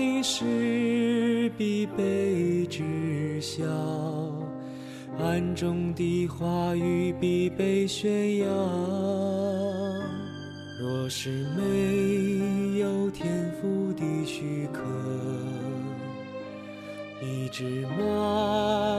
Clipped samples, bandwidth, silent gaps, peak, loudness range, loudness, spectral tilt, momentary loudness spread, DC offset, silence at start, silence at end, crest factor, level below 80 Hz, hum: under 0.1%; 14 kHz; none; -14 dBFS; 5 LU; -28 LUFS; -6 dB/octave; 11 LU; under 0.1%; 0 s; 0 s; 14 dB; -60 dBFS; none